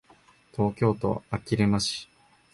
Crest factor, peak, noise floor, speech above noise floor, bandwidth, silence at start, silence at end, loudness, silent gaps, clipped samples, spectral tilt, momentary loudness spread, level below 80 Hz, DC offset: 18 dB; -10 dBFS; -59 dBFS; 33 dB; 11.5 kHz; 0.55 s; 0.5 s; -27 LUFS; none; under 0.1%; -5.5 dB/octave; 9 LU; -52 dBFS; under 0.1%